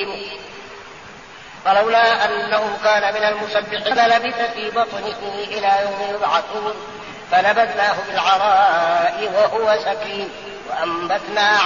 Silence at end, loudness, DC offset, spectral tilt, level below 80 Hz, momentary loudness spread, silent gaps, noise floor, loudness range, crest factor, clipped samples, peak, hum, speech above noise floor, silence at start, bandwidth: 0 s; -18 LUFS; 0.2%; 0.5 dB/octave; -58 dBFS; 18 LU; none; -38 dBFS; 3 LU; 14 dB; under 0.1%; -4 dBFS; none; 21 dB; 0 s; 7.2 kHz